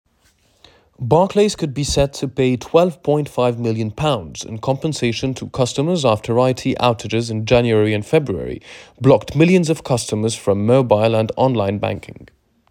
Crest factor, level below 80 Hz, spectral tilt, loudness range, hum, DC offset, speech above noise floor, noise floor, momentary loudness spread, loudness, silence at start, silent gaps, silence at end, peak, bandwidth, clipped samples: 18 dB; -42 dBFS; -6 dB/octave; 3 LU; none; under 0.1%; 41 dB; -58 dBFS; 9 LU; -18 LUFS; 1 s; none; 0.45 s; 0 dBFS; 16 kHz; under 0.1%